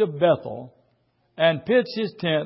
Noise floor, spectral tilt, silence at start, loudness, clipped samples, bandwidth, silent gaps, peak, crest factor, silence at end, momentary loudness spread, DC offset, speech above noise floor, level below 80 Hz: -67 dBFS; -10 dB/octave; 0 s; -22 LUFS; under 0.1%; 5.8 kHz; none; -6 dBFS; 18 dB; 0 s; 12 LU; under 0.1%; 45 dB; -66 dBFS